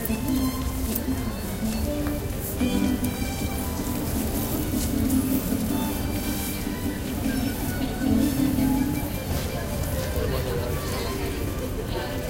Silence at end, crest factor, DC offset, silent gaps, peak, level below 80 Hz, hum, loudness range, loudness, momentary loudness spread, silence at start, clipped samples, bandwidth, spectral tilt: 0 s; 20 dB; under 0.1%; none; -6 dBFS; -34 dBFS; none; 2 LU; -27 LUFS; 6 LU; 0 s; under 0.1%; 17 kHz; -5.5 dB/octave